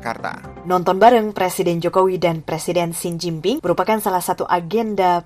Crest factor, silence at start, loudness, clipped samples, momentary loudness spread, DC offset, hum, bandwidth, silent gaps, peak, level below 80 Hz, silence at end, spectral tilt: 16 dB; 0 s; -18 LUFS; under 0.1%; 11 LU; under 0.1%; none; 15.5 kHz; none; -2 dBFS; -52 dBFS; 0.05 s; -5 dB/octave